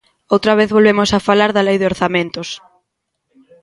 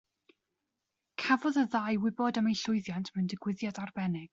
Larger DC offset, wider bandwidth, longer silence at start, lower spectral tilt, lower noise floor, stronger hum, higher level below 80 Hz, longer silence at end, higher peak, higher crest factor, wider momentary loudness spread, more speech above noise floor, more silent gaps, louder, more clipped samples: neither; first, 11.5 kHz vs 7.8 kHz; second, 0.3 s vs 1.2 s; about the same, -5 dB/octave vs -5.5 dB/octave; second, -73 dBFS vs -86 dBFS; neither; first, -46 dBFS vs -72 dBFS; first, 1.05 s vs 0.05 s; first, 0 dBFS vs -12 dBFS; about the same, 16 dB vs 20 dB; first, 13 LU vs 8 LU; first, 60 dB vs 55 dB; neither; first, -14 LUFS vs -32 LUFS; neither